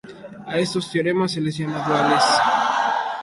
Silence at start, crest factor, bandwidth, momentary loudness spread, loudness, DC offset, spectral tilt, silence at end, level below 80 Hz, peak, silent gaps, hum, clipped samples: 0.05 s; 16 dB; 11.5 kHz; 9 LU; -20 LUFS; under 0.1%; -4.5 dB/octave; 0 s; -60 dBFS; -4 dBFS; none; none; under 0.1%